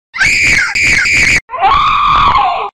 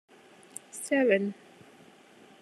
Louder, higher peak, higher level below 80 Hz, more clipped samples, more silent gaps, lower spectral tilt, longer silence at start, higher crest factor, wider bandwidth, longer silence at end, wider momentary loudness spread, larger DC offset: first, -8 LUFS vs -28 LUFS; first, -2 dBFS vs -12 dBFS; first, -28 dBFS vs -88 dBFS; neither; first, 1.41-1.48 s vs none; second, -1.5 dB/octave vs -4.5 dB/octave; second, 0.15 s vs 0.75 s; second, 8 dB vs 20 dB; first, 16 kHz vs 13.5 kHz; second, 0 s vs 1.1 s; second, 3 LU vs 21 LU; first, 2% vs under 0.1%